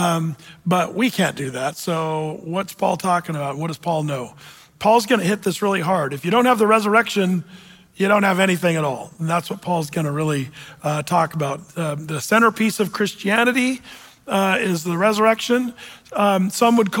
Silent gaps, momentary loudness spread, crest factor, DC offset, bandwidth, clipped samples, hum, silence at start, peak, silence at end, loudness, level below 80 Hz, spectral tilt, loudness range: none; 10 LU; 16 dB; under 0.1%; 17 kHz; under 0.1%; none; 0 s; -4 dBFS; 0 s; -20 LUFS; -62 dBFS; -5 dB/octave; 5 LU